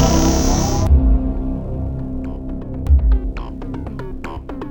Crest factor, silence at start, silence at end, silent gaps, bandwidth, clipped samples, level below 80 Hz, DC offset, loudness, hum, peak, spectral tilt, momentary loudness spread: 16 dB; 0 s; 0 s; none; 18 kHz; under 0.1%; -18 dBFS; under 0.1%; -20 LUFS; none; -2 dBFS; -6 dB/octave; 14 LU